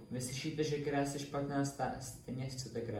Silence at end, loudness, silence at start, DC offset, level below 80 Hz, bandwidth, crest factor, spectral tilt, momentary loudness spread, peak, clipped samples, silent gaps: 0 s; -39 LUFS; 0 s; under 0.1%; -62 dBFS; 16.5 kHz; 16 dB; -5 dB/octave; 7 LU; -22 dBFS; under 0.1%; none